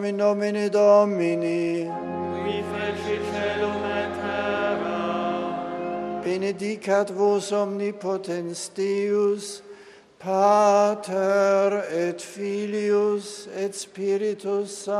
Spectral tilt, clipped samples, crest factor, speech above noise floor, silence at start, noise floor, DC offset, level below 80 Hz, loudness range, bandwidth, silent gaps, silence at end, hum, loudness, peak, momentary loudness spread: -5 dB/octave; under 0.1%; 18 dB; 25 dB; 0 s; -48 dBFS; under 0.1%; -62 dBFS; 5 LU; 12.5 kHz; none; 0 s; none; -24 LUFS; -6 dBFS; 11 LU